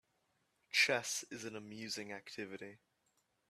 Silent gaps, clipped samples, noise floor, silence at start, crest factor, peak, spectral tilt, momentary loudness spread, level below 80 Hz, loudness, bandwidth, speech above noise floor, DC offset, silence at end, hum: none; under 0.1%; -80 dBFS; 0.75 s; 24 dB; -18 dBFS; -1.5 dB/octave; 16 LU; -86 dBFS; -38 LUFS; 14 kHz; 37 dB; under 0.1%; 0.75 s; none